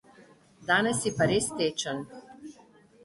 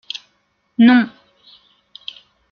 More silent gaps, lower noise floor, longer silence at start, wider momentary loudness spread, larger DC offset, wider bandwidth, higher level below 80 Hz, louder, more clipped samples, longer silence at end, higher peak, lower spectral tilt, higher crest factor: neither; second, -57 dBFS vs -65 dBFS; second, 0.6 s vs 0.8 s; about the same, 23 LU vs 22 LU; neither; first, 12 kHz vs 6.6 kHz; first, -60 dBFS vs -66 dBFS; second, -27 LUFS vs -14 LUFS; neither; second, 0.55 s vs 1.45 s; second, -10 dBFS vs -2 dBFS; second, -3.5 dB/octave vs -6 dB/octave; about the same, 20 dB vs 16 dB